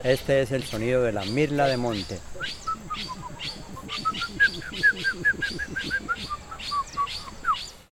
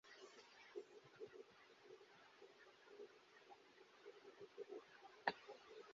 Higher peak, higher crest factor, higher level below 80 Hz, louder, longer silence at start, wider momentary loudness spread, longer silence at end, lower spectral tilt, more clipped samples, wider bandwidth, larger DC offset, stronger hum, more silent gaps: first, -8 dBFS vs -22 dBFS; second, 18 dB vs 36 dB; first, -46 dBFS vs under -90 dBFS; first, -26 LUFS vs -58 LUFS; about the same, 0 s vs 0.05 s; second, 11 LU vs 18 LU; about the same, 0.1 s vs 0 s; first, -4.5 dB/octave vs -0.5 dB/octave; neither; first, 17 kHz vs 7.4 kHz; neither; neither; neither